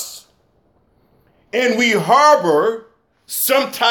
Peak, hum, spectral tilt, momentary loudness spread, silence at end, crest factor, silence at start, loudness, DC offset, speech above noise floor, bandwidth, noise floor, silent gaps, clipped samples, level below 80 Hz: -2 dBFS; none; -3 dB/octave; 14 LU; 0 s; 16 dB; 0 s; -15 LUFS; under 0.1%; 44 dB; 17 kHz; -59 dBFS; none; under 0.1%; -66 dBFS